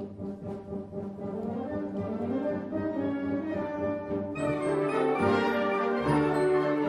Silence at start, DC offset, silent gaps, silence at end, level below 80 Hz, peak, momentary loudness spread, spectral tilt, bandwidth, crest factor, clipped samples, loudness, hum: 0 s; under 0.1%; none; 0 s; -58 dBFS; -12 dBFS; 12 LU; -7.5 dB/octave; 10.5 kHz; 16 dB; under 0.1%; -30 LUFS; none